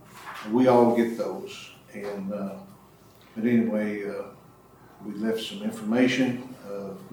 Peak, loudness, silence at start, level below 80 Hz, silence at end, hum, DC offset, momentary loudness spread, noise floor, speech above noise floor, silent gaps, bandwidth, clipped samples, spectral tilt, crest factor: -8 dBFS; -26 LUFS; 0.1 s; -68 dBFS; 0 s; none; under 0.1%; 20 LU; -53 dBFS; 28 dB; none; 19 kHz; under 0.1%; -6 dB/octave; 20 dB